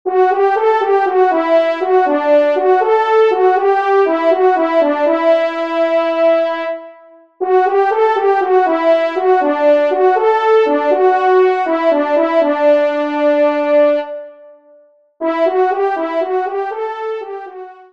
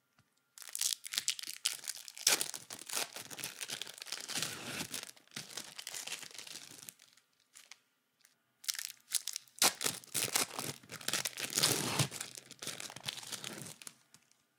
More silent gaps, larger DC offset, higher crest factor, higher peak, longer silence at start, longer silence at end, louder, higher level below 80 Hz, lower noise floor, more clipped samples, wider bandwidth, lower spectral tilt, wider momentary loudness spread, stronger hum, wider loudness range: neither; first, 0.3% vs under 0.1%; second, 12 dB vs 34 dB; first, -2 dBFS vs -6 dBFS; second, 0.05 s vs 0.55 s; second, 0.2 s vs 0.65 s; first, -13 LUFS vs -36 LUFS; first, -70 dBFS vs -84 dBFS; second, -49 dBFS vs -75 dBFS; neither; second, 6.6 kHz vs 18 kHz; first, -4 dB/octave vs -1 dB/octave; second, 9 LU vs 16 LU; neither; second, 4 LU vs 12 LU